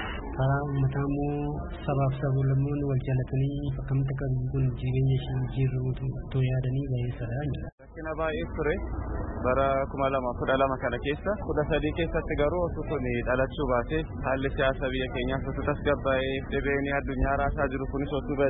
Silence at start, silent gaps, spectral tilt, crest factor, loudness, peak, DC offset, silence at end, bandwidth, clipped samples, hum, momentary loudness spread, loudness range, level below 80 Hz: 0 s; 7.72-7.78 s; -11.5 dB/octave; 16 dB; -29 LUFS; -12 dBFS; under 0.1%; 0 s; 4 kHz; under 0.1%; none; 6 LU; 2 LU; -38 dBFS